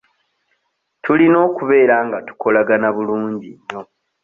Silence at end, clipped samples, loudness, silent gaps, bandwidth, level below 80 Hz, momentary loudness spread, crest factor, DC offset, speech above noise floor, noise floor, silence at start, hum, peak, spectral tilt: 0.4 s; under 0.1%; -15 LUFS; none; 3.8 kHz; -62 dBFS; 18 LU; 16 dB; under 0.1%; 54 dB; -69 dBFS; 1.05 s; none; 0 dBFS; -8.5 dB/octave